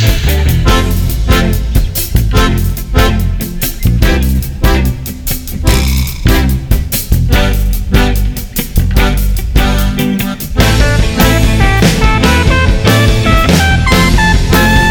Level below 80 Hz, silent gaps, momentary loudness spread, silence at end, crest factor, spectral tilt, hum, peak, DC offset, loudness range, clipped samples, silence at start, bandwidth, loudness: -12 dBFS; none; 7 LU; 0 s; 10 dB; -5 dB/octave; none; 0 dBFS; under 0.1%; 4 LU; under 0.1%; 0 s; over 20 kHz; -11 LUFS